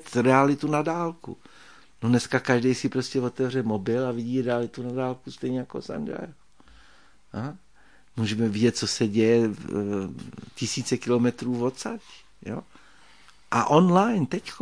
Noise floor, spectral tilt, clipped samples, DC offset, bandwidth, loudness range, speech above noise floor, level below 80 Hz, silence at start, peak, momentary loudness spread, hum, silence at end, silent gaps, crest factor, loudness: -59 dBFS; -6 dB/octave; under 0.1%; 0.2%; 10.5 kHz; 7 LU; 34 dB; -62 dBFS; 0 s; -4 dBFS; 17 LU; none; 0 s; none; 22 dB; -25 LUFS